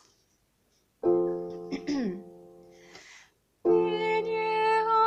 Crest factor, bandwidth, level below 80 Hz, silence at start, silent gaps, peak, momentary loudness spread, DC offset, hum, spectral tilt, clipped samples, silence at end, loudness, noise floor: 16 dB; 8.4 kHz; -68 dBFS; 1.05 s; none; -14 dBFS; 23 LU; under 0.1%; none; -6 dB/octave; under 0.1%; 0 s; -28 LUFS; -70 dBFS